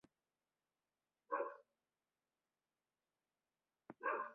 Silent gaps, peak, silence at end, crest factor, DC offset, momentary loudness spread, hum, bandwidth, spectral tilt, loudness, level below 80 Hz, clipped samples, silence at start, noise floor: none; -28 dBFS; 0 s; 24 dB; under 0.1%; 19 LU; none; 4.3 kHz; -3 dB/octave; -46 LUFS; under -90 dBFS; under 0.1%; 1.3 s; under -90 dBFS